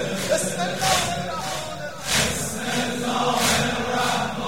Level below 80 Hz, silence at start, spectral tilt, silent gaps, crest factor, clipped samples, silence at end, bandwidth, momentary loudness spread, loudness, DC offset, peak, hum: -48 dBFS; 0 s; -2.5 dB/octave; none; 18 dB; under 0.1%; 0 s; 16.5 kHz; 8 LU; -23 LUFS; 0.9%; -6 dBFS; none